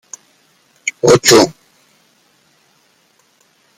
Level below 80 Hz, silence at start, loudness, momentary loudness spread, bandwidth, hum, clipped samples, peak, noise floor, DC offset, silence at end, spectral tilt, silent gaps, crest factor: -52 dBFS; 0.85 s; -11 LUFS; 27 LU; 16.5 kHz; none; under 0.1%; 0 dBFS; -56 dBFS; under 0.1%; 2.25 s; -3 dB/octave; none; 18 dB